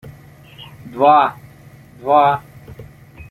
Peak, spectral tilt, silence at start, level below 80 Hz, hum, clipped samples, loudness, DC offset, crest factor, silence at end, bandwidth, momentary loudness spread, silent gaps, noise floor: -2 dBFS; -6.5 dB/octave; 0.05 s; -52 dBFS; none; under 0.1%; -15 LUFS; under 0.1%; 16 dB; 0.1 s; 13 kHz; 25 LU; none; -42 dBFS